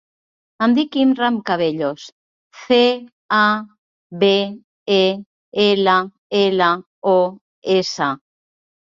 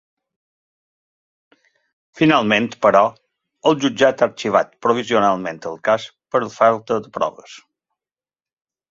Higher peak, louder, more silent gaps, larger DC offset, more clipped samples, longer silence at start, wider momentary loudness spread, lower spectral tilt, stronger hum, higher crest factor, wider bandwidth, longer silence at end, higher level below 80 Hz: about the same, -2 dBFS vs -2 dBFS; about the same, -18 LUFS vs -18 LUFS; first, 2.12-2.50 s, 3.12-3.29 s, 3.78-4.10 s, 4.64-4.86 s, 5.26-5.52 s, 6.18-6.30 s, 6.86-7.02 s, 7.41-7.62 s vs none; neither; neither; second, 0.6 s vs 2.15 s; first, 12 LU vs 9 LU; about the same, -5 dB/octave vs -5 dB/octave; neither; about the same, 16 dB vs 18 dB; about the same, 7.6 kHz vs 7.8 kHz; second, 0.85 s vs 1.35 s; about the same, -64 dBFS vs -62 dBFS